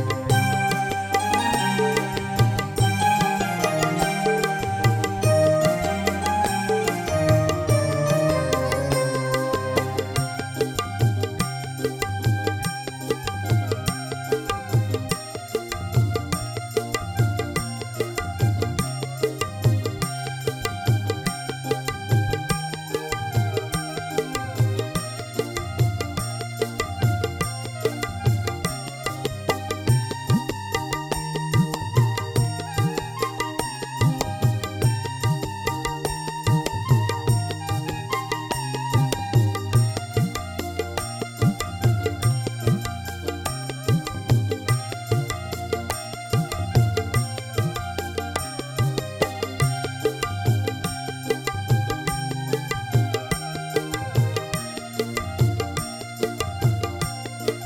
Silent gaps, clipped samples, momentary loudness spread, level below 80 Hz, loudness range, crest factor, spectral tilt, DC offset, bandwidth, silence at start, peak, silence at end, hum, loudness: none; under 0.1%; 7 LU; -44 dBFS; 4 LU; 18 dB; -5.5 dB/octave; under 0.1%; 19.5 kHz; 0 s; -4 dBFS; 0 s; none; -24 LUFS